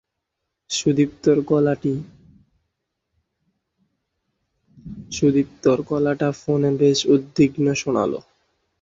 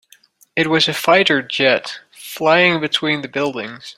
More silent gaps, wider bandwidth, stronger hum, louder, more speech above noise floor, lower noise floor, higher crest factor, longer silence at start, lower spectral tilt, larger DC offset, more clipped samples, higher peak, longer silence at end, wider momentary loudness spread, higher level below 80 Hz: neither; second, 8 kHz vs 16 kHz; neither; second, -20 LUFS vs -16 LUFS; first, 60 dB vs 35 dB; first, -79 dBFS vs -52 dBFS; about the same, 18 dB vs 16 dB; first, 0.7 s vs 0.55 s; first, -6 dB/octave vs -4 dB/octave; neither; neither; second, -4 dBFS vs 0 dBFS; first, 0.6 s vs 0.05 s; second, 9 LU vs 14 LU; first, -56 dBFS vs -62 dBFS